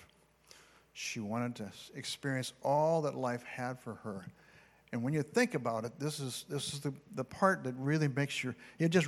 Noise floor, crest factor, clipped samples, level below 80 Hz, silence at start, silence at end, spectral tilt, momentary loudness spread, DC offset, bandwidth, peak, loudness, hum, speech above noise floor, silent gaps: -65 dBFS; 24 dB; under 0.1%; -74 dBFS; 0 s; 0 s; -5.5 dB/octave; 13 LU; under 0.1%; 15 kHz; -12 dBFS; -36 LUFS; none; 30 dB; none